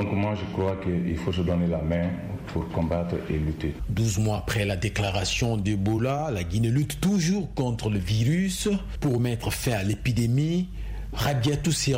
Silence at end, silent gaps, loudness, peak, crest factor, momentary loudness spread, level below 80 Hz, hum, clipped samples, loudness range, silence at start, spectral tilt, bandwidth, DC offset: 0 s; none; -26 LUFS; -12 dBFS; 14 dB; 5 LU; -40 dBFS; none; under 0.1%; 2 LU; 0 s; -5.5 dB/octave; 16 kHz; under 0.1%